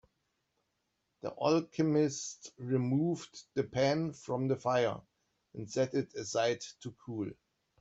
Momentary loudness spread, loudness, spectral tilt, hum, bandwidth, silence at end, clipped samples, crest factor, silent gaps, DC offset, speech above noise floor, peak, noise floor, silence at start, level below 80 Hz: 14 LU; -34 LUFS; -5.5 dB/octave; none; 8.2 kHz; 0.45 s; under 0.1%; 20 dB; none; under 0.1%; 49 dB; -16 dBFS; -82 dBFS; 1.25 s; -72 dBFS